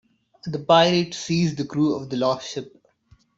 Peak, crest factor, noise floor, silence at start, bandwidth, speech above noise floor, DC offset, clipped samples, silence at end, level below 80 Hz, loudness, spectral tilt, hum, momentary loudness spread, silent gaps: -4 dBFS; 20 dB; -58 dBFS; 0.45 s; 8 kHz; 37 dB; under 0.1%; under 0.1%; 0.7 s; -60 dBFS; -22 LUFS; -5.5 dB/octave; none; 16 LU; none